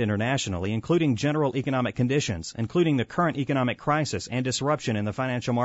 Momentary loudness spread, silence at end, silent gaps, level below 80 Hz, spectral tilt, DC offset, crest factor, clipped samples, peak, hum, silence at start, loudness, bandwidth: 5 LU; 0 s; none; -58 dBFS; -5.5 dB/octave; under 0.1%; 14 dB; under 0.1%; -10 dBFS; none; 0 s; -26 LUFS; 8 kHz